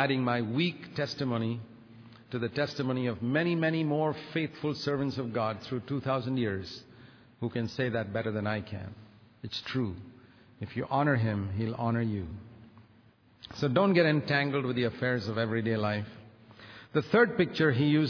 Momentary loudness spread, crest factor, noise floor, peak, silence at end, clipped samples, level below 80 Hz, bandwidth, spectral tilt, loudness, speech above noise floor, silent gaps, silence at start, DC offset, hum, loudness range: 15 LU; 20 dB; -61 dBFS; -10 dBFS; 0 s; under 0.1%; -64 dBFS; 5.4 kHz; -7.5 dB/octave; -30 LUFS; 31 dB; none; 0 s; under 0.1%; none; 6 LU